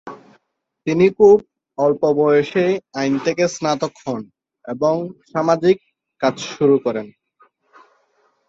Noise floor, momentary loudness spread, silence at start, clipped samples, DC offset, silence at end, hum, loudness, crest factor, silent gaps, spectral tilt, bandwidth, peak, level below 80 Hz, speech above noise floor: -69 dBFS; 16 LU; 0.05 s; under 0.1%; under 0.1%; 1.4 s; none; -18 LUFS; 18 dB; none; -6 dB/octave; 7.8 kHz; -2 dBFS; -60 dBFS; 52 dB